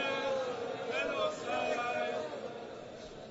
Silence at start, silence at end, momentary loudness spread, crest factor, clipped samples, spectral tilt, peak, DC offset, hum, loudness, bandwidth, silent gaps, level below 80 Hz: 0 s; 0 s; 13 LU; 14 dB; under 0.1%; -1.5 dB/octave; -22 dBFS; under 0.1%; none; -36 LUFS; 7.6 kHz; none; -68 dBFS